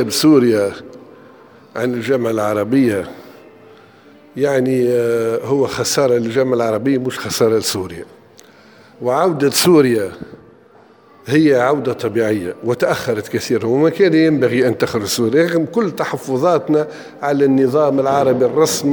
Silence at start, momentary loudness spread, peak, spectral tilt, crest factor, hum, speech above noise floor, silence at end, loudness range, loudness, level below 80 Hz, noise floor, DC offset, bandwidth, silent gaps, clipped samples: 0 s; 10 LU; -2 dBFS; -5 dB/octave; 16 dB; none; 31 dB; 0 s; 3 LU; -16 LUFS; -56 dBFS; -47 dBFS; under 0.1%; over 20 kHz; none; under 0.1%